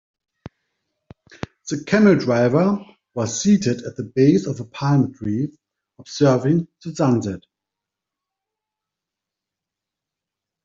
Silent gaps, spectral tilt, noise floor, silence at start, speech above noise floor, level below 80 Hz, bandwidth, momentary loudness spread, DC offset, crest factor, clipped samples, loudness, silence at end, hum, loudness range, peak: none; -6.5 dB/octave; -86 dBFS; 1.65 s; 67 dB; -58 dBFS; 7.8 kHz; 16 LU; under 0.1%; 18 dB; under 0.1%; -19 LUFS; 3.25 s; none; 8 LU; -4 dBFS